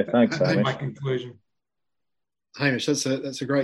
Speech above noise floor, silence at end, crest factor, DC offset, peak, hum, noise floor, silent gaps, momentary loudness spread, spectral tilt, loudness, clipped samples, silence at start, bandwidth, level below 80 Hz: 63 dB; 0 s; 18 dB; under 0.1%; -8 dBFS; none; -86 dBFS; none; 9 LU; -5 dB/octave; -24 LUFS; under 0.1%; 0 s; 12.5 kHz; -66 dBFS